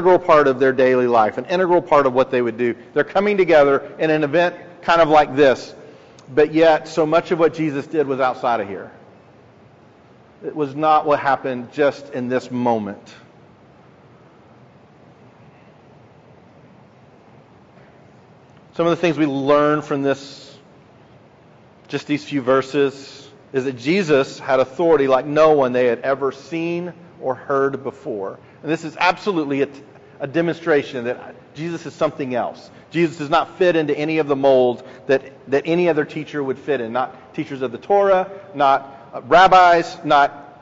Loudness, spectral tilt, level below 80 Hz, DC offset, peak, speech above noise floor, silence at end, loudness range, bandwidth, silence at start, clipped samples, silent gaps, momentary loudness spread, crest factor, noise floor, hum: -18 LUFS; -4 dB/octave; -56 dBFS; under 0.1%; -2 dBFS; 31 dB; 0.15 s; 7 LU; 8 kHz; 0 s; under 0.1%; none; 15 LU; 16 dB; -48 dBFS; none